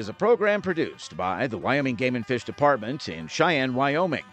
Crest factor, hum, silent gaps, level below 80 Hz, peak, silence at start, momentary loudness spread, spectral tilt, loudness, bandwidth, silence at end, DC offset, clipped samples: 18 dB; none; none; -64 dBFS; -8 dBFS; 0 s; 9 LU; -5.5 dB/octave; -25 LUFS; 9 kHz; 0.1 s; under 0.1%; under 0.1%